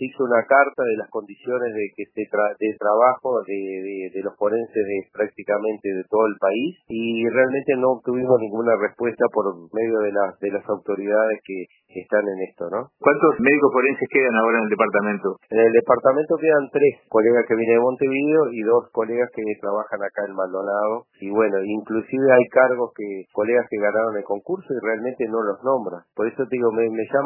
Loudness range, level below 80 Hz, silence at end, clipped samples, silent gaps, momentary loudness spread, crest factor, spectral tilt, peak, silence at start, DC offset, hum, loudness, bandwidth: 5 LU; -70 dBFS; 0 s; under 0.1%; none; 11 LU; 20 dB; -10.5 dB/octave; -2 dBFS; 0 s; under 0.1%; none; -21 LUFS; 3.1 kHz